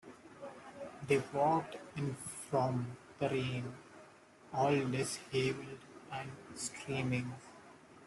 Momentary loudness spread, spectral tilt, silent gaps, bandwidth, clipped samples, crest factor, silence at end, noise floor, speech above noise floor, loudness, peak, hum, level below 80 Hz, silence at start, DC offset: 19 LU; -5.5 dB/octave; none; 12 kHz; under 0.1%; 20 dB; 0 s; -60 dBFS; 24 dB; -37 LUFS; -18 dBFS; none; -70 dBFS; 0.05 s; under 0.1%